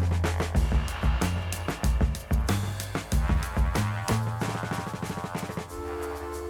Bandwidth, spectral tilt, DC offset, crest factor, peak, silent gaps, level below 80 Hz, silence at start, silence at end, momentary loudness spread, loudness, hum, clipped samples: 18 kHz; -5.5 dB/octave; under 0.1%; 16 dB; -12 dBFS; none; -30 dBFS; 0 s; 0 s; 7 LU; -29 LUFS; none; under 0.1%